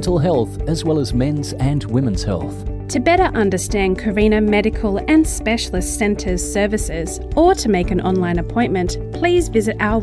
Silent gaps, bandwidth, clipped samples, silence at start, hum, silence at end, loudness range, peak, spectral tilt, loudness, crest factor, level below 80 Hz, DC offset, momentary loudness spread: none; 11 kHz; under 0.1%; 0 s; none; 0 s; 2 LU; -2 dBFS; -5.5 dB/octave; -18 LUFS; 14 dB; -28 dBFS; under 0.1%; 7 LU